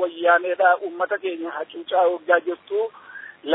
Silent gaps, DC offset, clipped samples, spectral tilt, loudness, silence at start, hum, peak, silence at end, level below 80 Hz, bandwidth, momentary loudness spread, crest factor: none; under 0.1%; under 0.1%; -6.5 dB/octave; -22 LUFS; 0 s; none; -4 dBFS; 0 s; -82 dBFS; 4 kHz; 13 LU; 18 dB